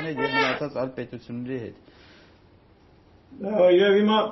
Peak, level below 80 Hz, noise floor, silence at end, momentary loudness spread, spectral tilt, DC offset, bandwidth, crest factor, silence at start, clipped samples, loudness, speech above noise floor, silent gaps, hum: -8 dBFS; -62 dBFS; -55 dBFS; 0 s; 18 LU; -3.5 dB/octave; under 0.1%; 6 kHz; 16 dB; 0 s; under 0.1%; -22 LUFS; 32 dB; none; none